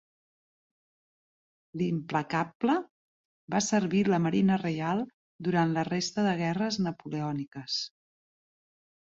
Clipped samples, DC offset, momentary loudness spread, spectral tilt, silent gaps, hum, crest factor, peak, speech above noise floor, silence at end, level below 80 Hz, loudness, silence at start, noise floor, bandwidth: under 0.1%; under 0.1%; 9 LU; -5.5 dB/octave; 2.55-2.60 s, 2.90-3.48 s, 5.14-5.39 s; none; 16 dB; -14 dBFS; over 62 dB; 1.3 s; -68 dBFS; -29 LUFS; 1.75 s; under -90 dBFS; 8 kHz